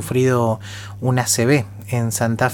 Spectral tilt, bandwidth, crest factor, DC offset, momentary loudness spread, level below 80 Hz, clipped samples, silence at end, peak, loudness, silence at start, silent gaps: -5 dB/octave; 18.5 kHz; 18 dB; under 0.1%; 9 LU; -52 dBFS; under 0.1%; 0 s; -2 dBFS; -19 LUFS; 0 s; none